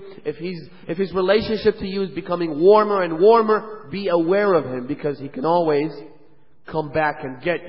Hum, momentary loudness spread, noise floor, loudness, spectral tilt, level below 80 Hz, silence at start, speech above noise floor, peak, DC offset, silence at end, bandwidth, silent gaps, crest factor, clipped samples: none; 15 LU; -56 dBFS; -20 LUFS; -11 dB/octave; -52 dBFS; 0 s; 37 dB; -2 dBFS; 0.6%; 0 s; 5.8 kHz; none; 18 dB; under 0.1%